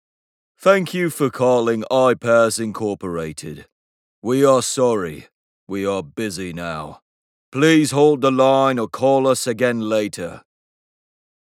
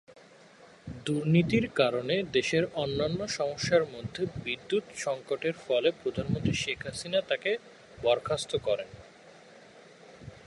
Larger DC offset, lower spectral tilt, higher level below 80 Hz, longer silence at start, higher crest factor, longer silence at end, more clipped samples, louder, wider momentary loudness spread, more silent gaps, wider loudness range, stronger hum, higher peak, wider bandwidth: neither; about the same, -5 dB/octave vs -5 dB/octave; about the same, -58 dBFS vs -56 dBFS; first, 0.6 s vs 0.1 s; about the same, 18 dB vs 20 dB; first, 1.1 s vs 0.05 s; neither; first, -18 LUFS vs -30 LUFS; first, 15 LU vs 9 LU; first, 3.72-4.22 s, 5.34-5.67 s, 7.02-7.52 s vs none; about the same, 5 LU vs 4 LU; neither; first, 0 dBFS vs -10 dBFS; first, 16.5 kHz vs 11.5 kHz